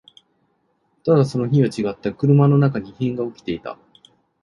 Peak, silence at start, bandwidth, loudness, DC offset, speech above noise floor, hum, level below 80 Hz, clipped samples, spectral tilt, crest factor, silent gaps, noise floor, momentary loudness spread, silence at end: -2 dBFS; 1.05 s; 10.5 kHz; -19 LUFS; under 0.1%; 48 dB; none; -56 dBFS; under 0.1%; -9 dB/octave; 18 dB; none; -66 dBFS; 14 LU; 0.7 s